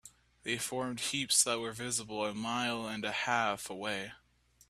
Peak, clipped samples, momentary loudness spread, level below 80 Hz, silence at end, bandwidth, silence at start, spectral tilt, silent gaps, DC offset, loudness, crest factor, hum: -12 dBFS; under 0.1%; 10 LU; -70 dBFS; 0.5 s; 15.5 kHz; 0.05 s; -2 dB/octave; none; under 0.1%; -33 LUFS; 24 dB; none